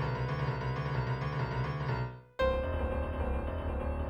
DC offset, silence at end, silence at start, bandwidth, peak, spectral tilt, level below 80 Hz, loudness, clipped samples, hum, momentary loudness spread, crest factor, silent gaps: under 0.1%; 0 s; 0 s; 7.4 kHz; -18 dBFS; -8 dB/octave; -40 dBFS; -35 LUFS; under 0.1%; none; 4 LU; 14 dB; none